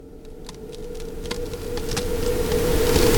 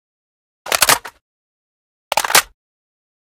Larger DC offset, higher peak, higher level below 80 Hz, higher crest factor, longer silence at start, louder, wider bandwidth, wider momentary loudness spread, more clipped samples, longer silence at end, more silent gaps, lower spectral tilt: neither; second, -4 dBFS vs 0 dBFS; first, -28 dBFS vs -54 dBFS; about the same, 20 dB vs 22 dB; second, 0 s vs 0.65 s; second, -25 LUFS vs -15 LUFS; about the same, 19 kHz vs over 20 kHz; first, 19 LU vs 9 LU; neither; second, 0 s vs 0.9 s; second, none vs 1.21-2.11 s; first, -4.5 dB/octave vs 0.5 dB/octave